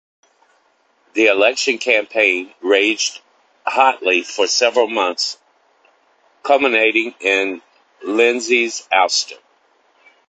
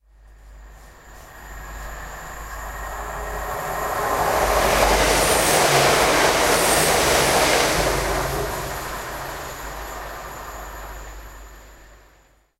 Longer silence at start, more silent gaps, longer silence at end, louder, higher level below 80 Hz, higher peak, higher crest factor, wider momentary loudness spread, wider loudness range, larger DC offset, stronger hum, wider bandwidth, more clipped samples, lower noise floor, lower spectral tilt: first, 1.15 s vs 0.3 s; neither; first, 0.95 s vs 0.65 s; first, -16 LUFS vs -19 LUFS; second, -68 dBFS vs -36 dBFS; first, 0 dBFS vs -4 dBFS; about the same, 18 dB vs 18 dB; second, 10 LU vs 19 LU; second, 2 LU vs 18 LU; neither; neither; second, 9.2 kHz vs 16 kHz; neither; first, -60 dBFS vs -56 dBFS; second, -0.5 dB/octave vs -2.5 dB/octave